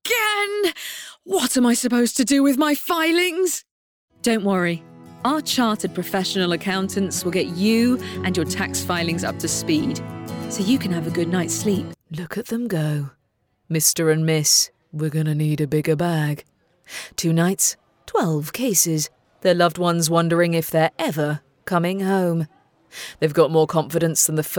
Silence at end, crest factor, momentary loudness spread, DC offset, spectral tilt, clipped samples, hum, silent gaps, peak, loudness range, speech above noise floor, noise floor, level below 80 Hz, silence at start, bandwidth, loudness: 0 s; 18 dB; 11 LU; under 0.1%; -4 dB/octave; under 0.1%; none; 3.71-4.08 s; -4 dBFS; 3 LU; 48 dB; -68 dBFS; -58 dBFS; 0.05 s; over 20 kHz; -21 LUFS